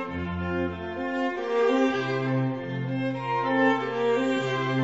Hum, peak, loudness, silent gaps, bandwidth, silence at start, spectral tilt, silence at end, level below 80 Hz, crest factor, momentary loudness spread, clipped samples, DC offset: none; -10 dBFS; -26 LUFS; none; 8 kHz; 0 s; -7 dB/octave; 0 s; -54 dBFS; 16 dB; 8 LU; under 0.1%; 0.1%